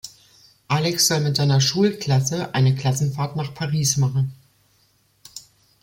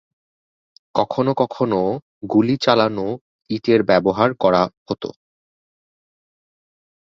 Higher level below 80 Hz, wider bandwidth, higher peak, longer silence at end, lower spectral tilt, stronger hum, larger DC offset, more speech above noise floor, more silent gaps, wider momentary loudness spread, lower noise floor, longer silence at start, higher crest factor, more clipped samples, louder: about the same, -56 dBFS vs -56 dBFS; first, 16.5 kHz vs 7.6 kHz; second, -6 dBFS vs -2 dBFS; second, 0.45 s vs 2.1 s; second, -4.5 dB/octave vs -7 dB/octave; neither; neither; second, 42 dB vs over 72 dB; second, none vs 2.02-2.21 s, 3.21-3.39 s, 4.77-4.86 s; first, 18 LU vs 12 LU; second, -62 dBFS vs under -90 dBFS; second, 0.05 s vs 0.95 s; about the same, 16 dB vs 20 dB; neither; about the same, -20 LUFS vs -19 LUFS